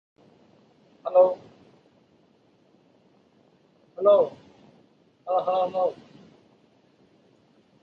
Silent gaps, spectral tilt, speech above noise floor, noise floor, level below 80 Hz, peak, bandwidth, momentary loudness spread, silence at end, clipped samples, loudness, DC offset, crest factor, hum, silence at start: none; -7 dB/octave; 40 dB; -62 dBFS; -78 dBFS; -6 dBFS; 5.2 kHz; 22 LU; 1.9 s; under 0.1%; -24 LUFS; under 0.1%; 22 dB; none; 1.05 s